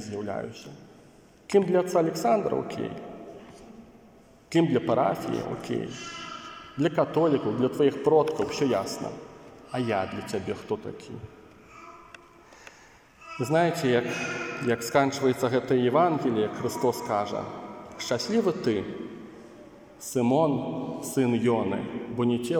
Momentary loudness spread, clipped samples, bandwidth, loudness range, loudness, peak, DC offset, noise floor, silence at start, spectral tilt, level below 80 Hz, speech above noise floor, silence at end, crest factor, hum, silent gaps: 20 LU; under 0.1%; 17 kHz; 7 LU; -27 LUFS; -8 dBFS; under 0.1%; -54 dBFS; 0 s; -6 dB/octave; -64 dBFS; 28 dB; 0 s; 20 dB; none; none